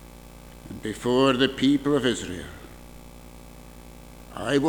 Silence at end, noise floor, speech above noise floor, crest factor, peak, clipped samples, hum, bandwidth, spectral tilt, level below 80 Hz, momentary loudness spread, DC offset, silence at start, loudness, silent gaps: 0 s; -45 dBFS; 22 dB; 22 dB; -6 dBFS; under 0.1%; 60 Hz at -55 dBFS; 20 kHz; -5 dB/octave; -48 dBFS; 25 LU; under 0.1%; 0 s; -24 LUFS; none